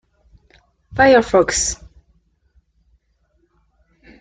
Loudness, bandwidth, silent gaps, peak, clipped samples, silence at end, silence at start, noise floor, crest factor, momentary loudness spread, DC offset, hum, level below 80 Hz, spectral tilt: -15 LUFS; 9.6 kHz; none; -2 dBFS; under 0.1%; 2.45 s; 0.95 s; -63 dBFS; 20 dB; 17 LU; under 0.1%; none; -44 dBFS; -3 dB/octave